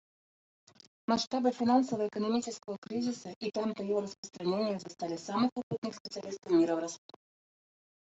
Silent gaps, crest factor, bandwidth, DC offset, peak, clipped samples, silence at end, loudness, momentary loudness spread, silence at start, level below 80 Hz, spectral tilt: 1.27-1.31 s, 2.78-2.82 s, 3.36-3.41 s, 4.18-4.23 s, 5.52-5.56 s, 5.63-5.71 s, 5.78-5.82 s, 6.00-6.05 s; 20 dB; 8 kHz; under 0.1%; -14 dBFS; under 0.1%; 1.1 s; -33 LUFS; 13 LU; 1.1 s; -76 dBFS; -5 dB/octave